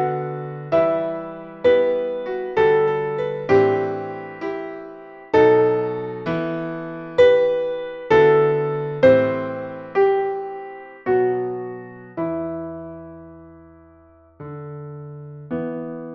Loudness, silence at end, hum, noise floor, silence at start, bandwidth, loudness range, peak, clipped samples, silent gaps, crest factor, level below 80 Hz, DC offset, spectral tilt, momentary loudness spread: -20 LUFS; 0 s; none; -50 dBFS; 0 s; 6.6 kHz; 14 LU; -2 dBFS; under 0.1%; none; 18 dB; -56 dBFS; under 0.1%; -8 dB/octave; 20 LU